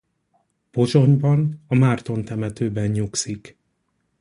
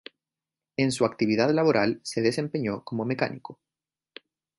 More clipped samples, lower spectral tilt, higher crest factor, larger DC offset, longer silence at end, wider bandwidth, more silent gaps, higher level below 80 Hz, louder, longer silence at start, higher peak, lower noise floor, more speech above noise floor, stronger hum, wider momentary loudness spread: neither; about the same, -6.5 dB/octave vs -5.5 dB/octave; about the same, 18 dB vs 20 dB; neither; second, 0.7 s vs 1.05 s; about the same, 11 kHz vs 11.5 kHz; neither; first, -52 dBFS vs -66 dBFS; first, -21 LUFS vs -26 LUFS; about the same, 0.75 s vs 0.8 s; first, -2 dBFS vs -8 dBFS; second, -71 dBFS vs under -90 dBFS; second, 51 dB vs over 65 dB; neither; first, 12 LU vs 9 LU